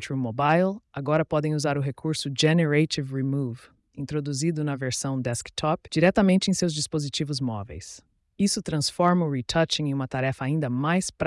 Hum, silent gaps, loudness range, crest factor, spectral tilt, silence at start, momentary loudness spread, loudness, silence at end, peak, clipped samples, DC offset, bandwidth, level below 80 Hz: none; none; 2 LU; 16 dB; -5 dB/octave; 0 s; 9 LU; -25 LUFS; 0 s; -10 dBFS; under 0.1%; under 0.1%; 12 kHz; -54 dBFS